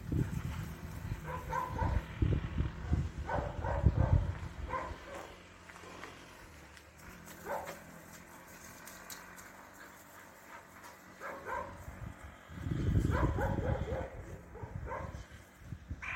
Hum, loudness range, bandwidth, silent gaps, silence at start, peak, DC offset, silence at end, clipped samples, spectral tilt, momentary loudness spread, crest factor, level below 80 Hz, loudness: none; 13 LU; 16.5 kHz; none; 0 s; -14 dBFS; under 0.1%; 0 s; under 0.1%; -7 dB/octave; 20 LU; 24 dB; -44 dBFS; -38 LUFS